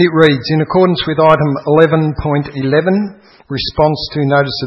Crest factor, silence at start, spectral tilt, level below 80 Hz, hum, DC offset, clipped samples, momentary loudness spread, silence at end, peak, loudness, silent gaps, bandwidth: 12 dB; 0 s; -8 dB/octave; -38 dBFS; none; under 0.1%; 0.2%; 7 LU; 0 s; 0 dBFS; -13 LUFS; none; 6.2 kHz